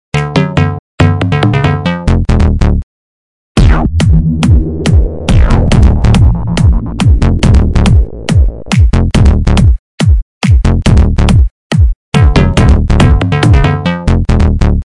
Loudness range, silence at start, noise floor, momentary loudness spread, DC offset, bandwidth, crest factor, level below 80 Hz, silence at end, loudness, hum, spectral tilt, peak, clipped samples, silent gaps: 2 LU; 0.15 s; under -90 dBFS; 4 LU; under 0.1%; 11 kHz; 8 dB; -12 dBFS; 0.1 s; -10 LUFS; none; -7 dB/octave; 0 dBFS; 0.1%; 0.79-0.98 s, 2.83-3.55 s, 9.79-9.98 s, 10.22-10.41 s, 11.51-11.70 s, 11.95-12.12 s